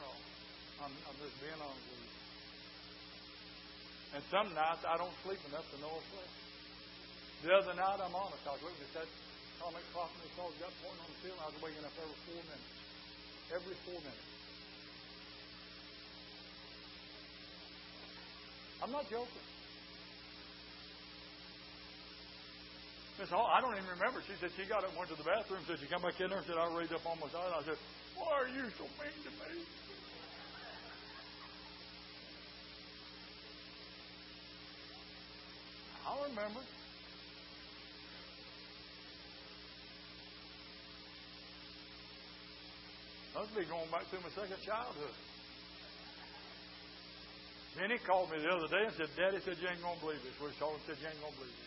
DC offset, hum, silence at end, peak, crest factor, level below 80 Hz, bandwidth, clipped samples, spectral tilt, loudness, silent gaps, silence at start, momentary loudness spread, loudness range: under 0.1%; 60 Hz at -65 dBFS; 0 s; -16 dBFS; 28 dB; -68 dBFS; 5.8 kHz; under 0.1%; -1.5 dB/octave; -44 LUFS; none; 0 s; 15 LU; 13 LU